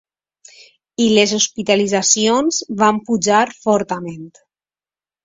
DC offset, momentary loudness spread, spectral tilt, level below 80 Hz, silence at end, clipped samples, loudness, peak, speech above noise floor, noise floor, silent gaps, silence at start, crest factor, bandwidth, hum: under 0.1%; 12 LU; -3 dB/octave; -58 dBFS; 0.95 s; under 0.1%; -16 LUFS; 0 dBFS; over 74 dB; under -90 dBFS; none; 1 s; 18 dB; 8 kHz; none